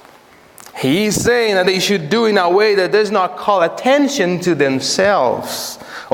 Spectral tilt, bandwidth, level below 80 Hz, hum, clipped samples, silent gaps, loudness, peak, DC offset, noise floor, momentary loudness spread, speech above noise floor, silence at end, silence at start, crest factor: -4 dB/octave; 17.5 kHz; -52 dBFS; none; under 0.1%; none; -15 LUFS; 0 dBFS; under 0.1%; -45 dBFS; 9 LU; 30 dB; 0 s; 0.65 s; 14 dB